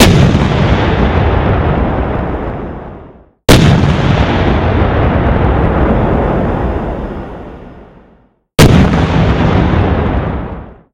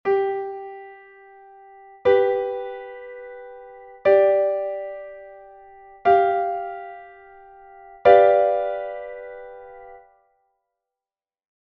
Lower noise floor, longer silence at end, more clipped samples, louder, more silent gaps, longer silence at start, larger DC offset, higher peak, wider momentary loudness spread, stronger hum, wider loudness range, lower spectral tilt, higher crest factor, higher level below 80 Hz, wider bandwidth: second, -48 dBFS vs under -90 dBFS; second, 0.2 s vs 1.7 s; first, 0.6% vs under 0.1%; first, -11 LUFS vs -20 LUFS; neither; about the same, 0 s vs 0.05 s; neither; about the same, 0 dBFS vs -2 dBFS; second, 16 LU vs 25 LU; neither; second, 3 LU vs 6 LU; first, -6.5 dB/octave vs -3 dB/octave; second, 10 dB vs 22 dB; first, -18 dBFS vs -62 dBFS; first, 17 kHz vs 5.2 kHz